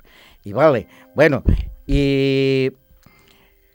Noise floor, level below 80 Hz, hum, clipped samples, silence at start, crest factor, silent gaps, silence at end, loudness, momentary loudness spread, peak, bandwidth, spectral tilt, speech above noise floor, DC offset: -53 dBFS; -28 dBFS; none; under 0.1%; 0.45 s; 20 dB; none; 1.05 s; -18 LUFS; 11 LU; 0 dBFS; 16.5 kHz; -7.5 dB/octave; 37 dB; under 0.1%